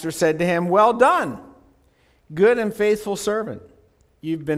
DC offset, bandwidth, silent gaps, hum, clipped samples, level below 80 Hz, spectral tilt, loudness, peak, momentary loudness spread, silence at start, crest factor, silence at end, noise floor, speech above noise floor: under 0.1%; 15.5 kHz; none; none; under 0.1%; -56 dBFS; -5.5 dB/octave; -19 LUFS; -4 dBFS; 19 LU; 0 s; 18 dB; 0 s; -59 dBFS; 40 dB